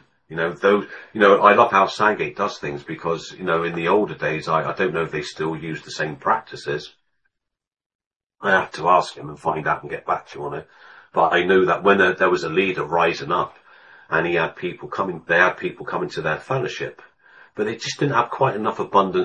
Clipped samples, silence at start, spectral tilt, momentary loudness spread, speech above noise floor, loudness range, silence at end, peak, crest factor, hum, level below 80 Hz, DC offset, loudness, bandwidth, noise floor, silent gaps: under 0.1%; 0.3 s; -5.5 dB/octave; 13 LU; 54 dB; 6 LU; 0 s; 0 dBFS; 22 dB; none; -60 dBFS; under 0.1%; -21 LUFS; 9 kHz; -74 dBFS; 7.86-7.99 s, 8.07-8.20 s, 8.26-8.30 s